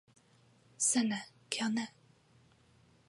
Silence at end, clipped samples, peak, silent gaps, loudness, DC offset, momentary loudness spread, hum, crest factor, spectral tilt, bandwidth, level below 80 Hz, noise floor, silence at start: 1.2 s; under 0.1%; -14 dBFS; none; -34 LUFS; under 0.1%; 11 LU; none; 24 dB; -2 dB/octave; 11.5 kHz; -82 dBFS; -66 dBFS; 0.8 s